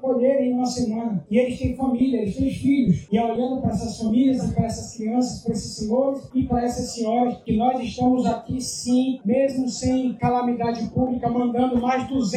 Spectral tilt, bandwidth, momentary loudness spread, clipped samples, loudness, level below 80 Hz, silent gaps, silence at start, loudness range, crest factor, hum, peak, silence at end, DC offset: -6.5 dB/octave; 12.5 kHz; 5 LU; under 0.1%; -23 LUFS; -44 dBFS; none; 0 s; 2 LU; 14 dB; none; -6 dBFS; 0 s; under 0.1%